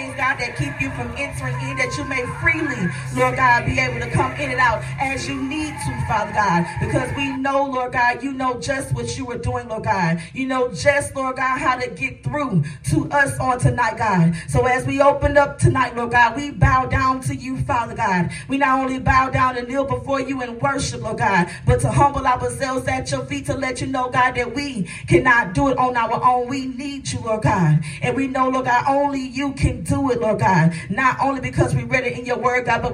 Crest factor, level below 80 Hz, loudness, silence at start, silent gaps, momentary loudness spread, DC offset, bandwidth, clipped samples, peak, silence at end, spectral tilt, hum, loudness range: 18 dB; -38 dBFS; -20 LUFS; 0 s; none; 8 LU; under 0.1%; 13 kHz; under 0.1%; 0 dBFS; 0 s; -5.5 dB/octave; none; 4 LU